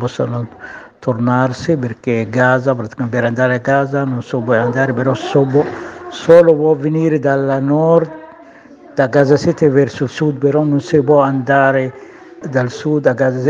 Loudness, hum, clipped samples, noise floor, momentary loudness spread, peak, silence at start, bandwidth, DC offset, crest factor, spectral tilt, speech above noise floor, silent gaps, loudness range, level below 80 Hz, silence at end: -14 LUFS; none; 0.1%; -40 dBFS; 11 LU; 0 dBFS; 0 s; 7.8 kHz; under 0.1%; 14 dB; -7.5 dB/octave; 26 dB; none; 3 LU; -54 dBFS; 0 s